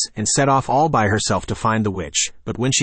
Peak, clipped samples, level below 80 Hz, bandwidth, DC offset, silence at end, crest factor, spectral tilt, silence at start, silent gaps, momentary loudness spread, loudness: -6 dBFS; under 0.1%; -44 dBFS; 8.8 kHz; under 0.1%; 0 s; 14 dB; -3.5 dB/octave; 0 s; none; 5 LU; -19 LUFS